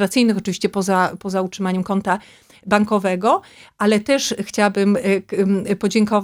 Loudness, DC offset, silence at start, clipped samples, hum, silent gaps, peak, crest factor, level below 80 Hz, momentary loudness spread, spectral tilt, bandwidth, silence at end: -19 LUFS; under 0.1%; 0 s; under 0.1%; none; none; 0 dBFS; 18 dB; -58 dBFS; 6 LU; -5 dB/octave; 15.5 kHz; 0 s